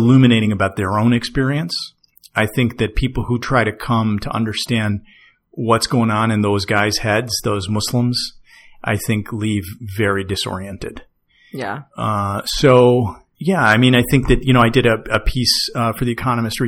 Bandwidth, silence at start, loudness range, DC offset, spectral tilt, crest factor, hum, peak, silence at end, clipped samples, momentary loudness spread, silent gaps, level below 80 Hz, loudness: 17 kHz; 0 s; 8 LU; under 0.1%; -5.5 dB/octave; 16 dB; none; 0 dBFS; 0 s; under 0.1%; 13 LU; none; -32 dBFS; -17 LUFS